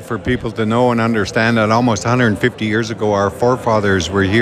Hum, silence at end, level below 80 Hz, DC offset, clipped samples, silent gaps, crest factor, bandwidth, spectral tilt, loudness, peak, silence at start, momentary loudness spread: none; 0 s; -42 dBFS; under 0.1%; under 0.1%; none; 14 dB; 14 kHz; -6 dB/octave; -15 LUFS; -2 dBFS; 0 s; 4 LU